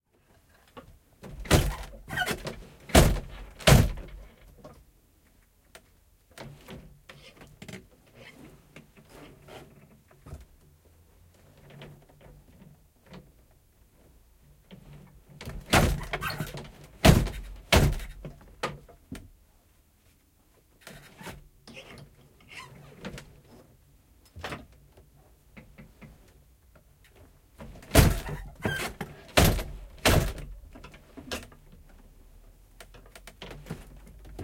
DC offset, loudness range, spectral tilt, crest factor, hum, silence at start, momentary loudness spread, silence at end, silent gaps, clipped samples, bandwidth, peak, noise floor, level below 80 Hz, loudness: under 0.1%; 24 LU; -4.5 dB/octave; 28 dB; none; 0.75 s; 29 LU; 0 s; none; under 0.1%; 16.5 kHz; -4 dBFS; -63 dBFS; -38 dBFS; -26 LUFS